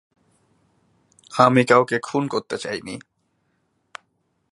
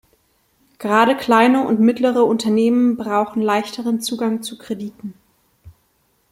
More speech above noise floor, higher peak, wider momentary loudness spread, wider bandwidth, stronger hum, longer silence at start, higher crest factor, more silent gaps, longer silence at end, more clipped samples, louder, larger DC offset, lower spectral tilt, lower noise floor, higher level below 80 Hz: first, 50 dB vs 46 dB; about the same, 0 dBFS vs -2 dBFS; first, 27 LU vs 14 LU; second, 11.5 kHz vs 15.5 kHz; neither; first, 1.3 s vs 0.8 s; about the same, 22 dB vs 18 dB; neither; first, 1.5 s vs 0.6 s; neither; second, -20 LUFS vs -17 LUFS; neither; about the same, -5.5 dB/octave vs -5 dB/octave; first, -70 dBFS vs -63 dBFS; second, -66 dBFS vs -60 dBFS